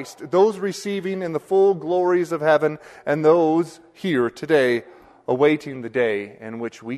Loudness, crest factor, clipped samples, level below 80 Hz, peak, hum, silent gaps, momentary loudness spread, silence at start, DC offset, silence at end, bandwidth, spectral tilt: -21 LUFS; 16 dB; under 0.1%; -66 dBFS; -4 dBFS; none; none; 13 LU; 0 s; under 0.1%; 0 s; 13 kHz; -6 dB/octave